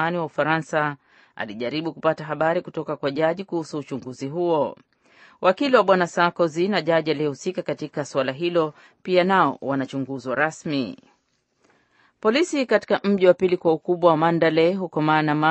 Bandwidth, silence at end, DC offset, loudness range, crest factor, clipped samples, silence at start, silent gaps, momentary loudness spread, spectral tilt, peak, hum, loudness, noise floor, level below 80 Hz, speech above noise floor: 8.4 kHz; 0 s; under 0.1%; 6 LU; 20 dB; under 0.1%; 0 s; none; 11 LU; -6 dB/octave; -2 dBFS; none; -22 LUFS; -69 dBFS; -70 dBFS; 47 dB